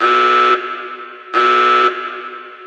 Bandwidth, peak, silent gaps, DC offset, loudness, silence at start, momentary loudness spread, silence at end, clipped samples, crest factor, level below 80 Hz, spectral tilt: 8.6 kHz; 0 dBFS; none; under 0.1%; -13 LUFS; 0 s; 18 LU; 0 s; under 0.1%; 14 dB; under -90 dBFS; -1.5 dB/octave